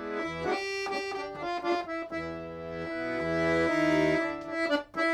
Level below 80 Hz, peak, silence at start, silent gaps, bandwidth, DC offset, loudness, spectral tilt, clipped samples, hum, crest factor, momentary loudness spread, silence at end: -60 dBFS; -14 dBFS; 0 s; none; 12.5 kHz; under 0.1%; -30 LUFS; -5.5 dB/octave; under 0.1%; none; 16 dB; 10 LU; 0 s